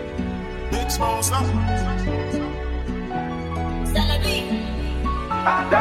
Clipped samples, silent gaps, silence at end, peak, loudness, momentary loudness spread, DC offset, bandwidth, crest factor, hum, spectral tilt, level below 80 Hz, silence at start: under 0.1%; none; 0 s; -4 dBFS; -24 LUFS; 7 LU; under 0.1%; 16 kHz; 18 dB; none; -4.5 dB/octave; -28 dBFS; 0 s